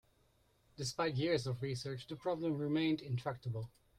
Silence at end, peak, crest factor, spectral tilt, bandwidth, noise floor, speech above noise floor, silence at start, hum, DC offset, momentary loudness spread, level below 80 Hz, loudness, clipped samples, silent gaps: 0.3 s; -22 dBFS; 18 dB; -6 dB/octave; 14 kHz; -73 dBFS; 35 dB; 0.8 s; none; under 0.1%; 9 LU; -68 dBFS; -38 LUFS; under 0.1%; none